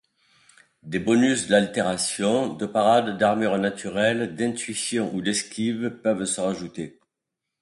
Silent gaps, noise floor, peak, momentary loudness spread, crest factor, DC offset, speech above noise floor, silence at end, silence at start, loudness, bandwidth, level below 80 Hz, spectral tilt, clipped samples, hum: none; -84 dBFS; -4 dBFS; 8 LU; 20 dB; under 0.1%; 61 dB; 0.7 s; 0.85 s; -23 LUFS; 11.5 kHz; -62 dBFS; -4 dB/octave; under 0.1%; none